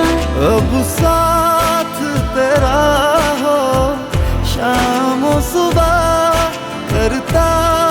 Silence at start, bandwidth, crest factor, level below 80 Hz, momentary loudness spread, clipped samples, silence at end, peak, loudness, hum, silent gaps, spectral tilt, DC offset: 0 s; over 20 kHz; 12 dB; -24 dBFS; 5 LU; under 0.1%; 0 s; -2 dBFS; -14 LUFS; none; none; -5 dB/octave; under 0.1%